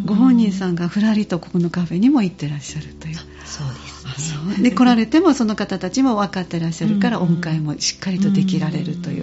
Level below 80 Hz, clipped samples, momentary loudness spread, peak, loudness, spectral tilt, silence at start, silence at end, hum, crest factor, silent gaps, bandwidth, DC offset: -48 dBFS; under 0.1%; 15 LU; -2 dBFS; -18 LUFS; -6 dB/octave; 0 s; 0 s; none; 16 dB; none; 8 kHz; under 0.1%